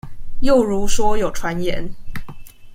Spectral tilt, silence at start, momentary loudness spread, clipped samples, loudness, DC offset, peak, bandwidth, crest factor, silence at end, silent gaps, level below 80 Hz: -5 dB/octave; 0.05 s; 19 LU; under 0.1%; -20 LUFS; under 0.1%; -2 dBFS; 15 kHz; 14 dB; 0 s; none; -28 dBFS